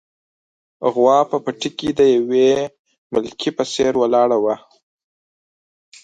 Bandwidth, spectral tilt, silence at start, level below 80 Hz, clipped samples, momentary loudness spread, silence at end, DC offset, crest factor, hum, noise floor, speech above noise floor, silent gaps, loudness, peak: 9.2 kHz; -5 dB/octave; 0.8 s; -58 dBFS; under 0.1%; 9 LU; 1.45 s; under 0.1%; 18 dB; none; under -90 dBFS; over 74 dB; 2.79-2.85 s, 2.98-3.10 s; -18 LUFS; -2 dBFS